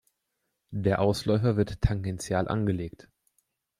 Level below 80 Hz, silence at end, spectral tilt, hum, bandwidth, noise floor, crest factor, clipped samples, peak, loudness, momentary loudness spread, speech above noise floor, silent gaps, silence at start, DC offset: -44 dBFS; 0.9 s; -7 dB/octave; none; 15 kHz; -80 dBFS; 20 dB; under 0.1%; -8 dBFS; -28 LUFS; 8 LU; 54 dB; none; 0.7 s; under 0.1%